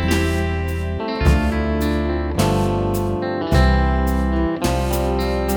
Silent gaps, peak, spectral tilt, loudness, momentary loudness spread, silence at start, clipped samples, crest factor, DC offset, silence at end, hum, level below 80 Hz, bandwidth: none; -2 dBFS; -6.5 dB/octave; -20 LUFS; 5 LU; 0 s; under 0.1%; 16 dB; under 0.1%; 0 s; none; -22 dBFS; over 20 kHz